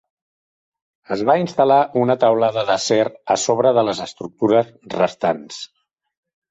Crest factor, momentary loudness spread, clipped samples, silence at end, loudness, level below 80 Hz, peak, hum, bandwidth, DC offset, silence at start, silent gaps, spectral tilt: 16 dB; 12 LU; under 0.1%; 0.85 s; -18 LUFS; -62 dBFS; -4 dBFS; none; 8.2 kHz; under 0.1%; 1.1 s; none; -4.5 dB/octave